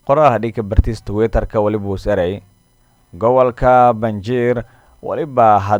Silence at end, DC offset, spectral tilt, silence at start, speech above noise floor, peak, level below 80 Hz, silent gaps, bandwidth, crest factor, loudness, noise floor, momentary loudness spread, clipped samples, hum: 0 s; under 0.1%; -8 dB/octave; 0.05 s; 40 dB; 0 dBFS; -26 dBFS; none; 19 kHz; 16 dB; -16 LUFS; -55 dBFS; 10 LU; under 0.1%; none